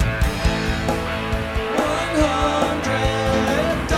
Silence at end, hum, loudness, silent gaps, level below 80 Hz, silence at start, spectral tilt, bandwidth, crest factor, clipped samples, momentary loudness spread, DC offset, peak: 0 s; none; -21 LUFS; none; -28 dBFS; 0 s; -5 dB/octave; 16 kHz; 16 dB; under 0.1%; 5 LU; under 0.1%; -4 dBFS